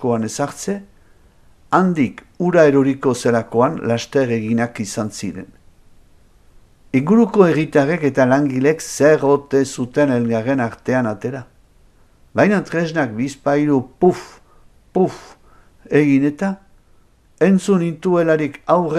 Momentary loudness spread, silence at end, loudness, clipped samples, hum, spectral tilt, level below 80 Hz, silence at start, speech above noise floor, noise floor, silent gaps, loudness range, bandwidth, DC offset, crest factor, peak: 10 LU; 0 s; -17 LUFS; under 0.1%; none; -6.5 dB/octave; -52 dBFS; 0 s; 35 dB; -52 dBFS; none; 5 LU; 14.5 kHz; under 0.1%; 18 dB; 0 dBFS